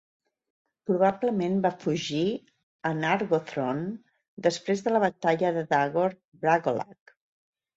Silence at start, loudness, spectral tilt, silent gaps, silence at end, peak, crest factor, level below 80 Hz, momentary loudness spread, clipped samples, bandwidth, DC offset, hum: 0.9 s; -27 LUFS; -6 dB/octave; 2.63-2.79 s, 4.28-4.37 s, 6.25-6.32 s; 0.85 s; -8 dBFS; 18 dB; -70 dBFS; 9 LU; under 0.1%; 8 kHz; under 0.1%; none